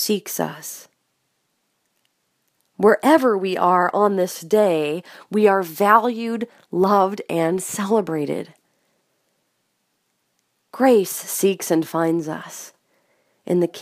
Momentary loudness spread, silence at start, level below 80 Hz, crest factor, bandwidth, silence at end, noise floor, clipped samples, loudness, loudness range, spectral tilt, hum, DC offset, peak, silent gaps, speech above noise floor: 14 LU; 0 s; -74 dBFS; 20 dB; 15.5 kHz; 0 s; -71 dBFS; under 0.1%; -19 LUFS; 6 LU; -5 dB/octave; none; under 0.1%; 0 dBFS; none; 52 dB